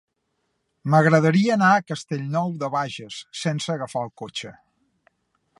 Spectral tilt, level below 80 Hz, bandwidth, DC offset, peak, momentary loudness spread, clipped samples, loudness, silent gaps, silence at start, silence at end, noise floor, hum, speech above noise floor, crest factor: -6 dB/octave; -68 dBFS; 11.5 kHz; under 0.1%; -2 dBFS; 17 LU; under 0.1%; -22 LUFS; none; 0.85 s; 1.05 s; -74 dBFS; none; 52 dB; 22 dB